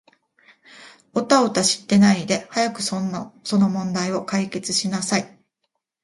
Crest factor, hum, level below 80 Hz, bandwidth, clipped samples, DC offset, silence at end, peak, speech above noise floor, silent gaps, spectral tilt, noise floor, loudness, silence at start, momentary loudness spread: 20 dB; none; -62 dBFS; 11.5 kHz; under 0.1%; under 0.1%; 0.75 s; -2 dBFS; 56 dB; none; -4 dB/octave; -76 dBFS; -21 LUFS; 0.75 s; 11 LU